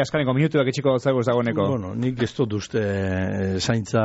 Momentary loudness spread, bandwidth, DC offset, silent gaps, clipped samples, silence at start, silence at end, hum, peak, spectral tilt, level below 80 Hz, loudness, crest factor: 4 LU; 8 kHz; under 0.1%; none; under 0.1%; 0 s; 0 s; none; -8 dBFS; -6 dB/octave; -52 dBFS; -23 LUFS; 14 dB